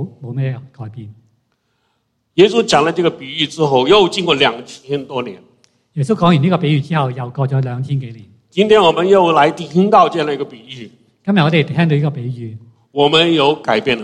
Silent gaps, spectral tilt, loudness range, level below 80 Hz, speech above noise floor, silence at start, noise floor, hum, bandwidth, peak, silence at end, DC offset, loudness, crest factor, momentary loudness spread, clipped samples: none; -6 dB/octave; 4 LU; -54 dBFS; 52 dB; 0 s; -66 dBFS; none; 10.5 kHz; 0 dBFS; 0 s; under 0.1%; -14 LUFS; 16 dB; 18 LU; under 0.1%